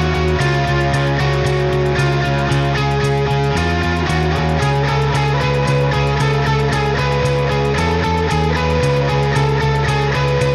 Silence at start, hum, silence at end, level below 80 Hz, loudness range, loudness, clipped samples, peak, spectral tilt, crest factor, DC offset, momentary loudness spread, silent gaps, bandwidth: 0 s; none; 0 s; -28 dBFS; 0 LU; -16 LUFS; under 0.1%; -4 dBFS; -6 dB/octave; 12 dB; under 0.1%; 1 LU; none; 12 kHz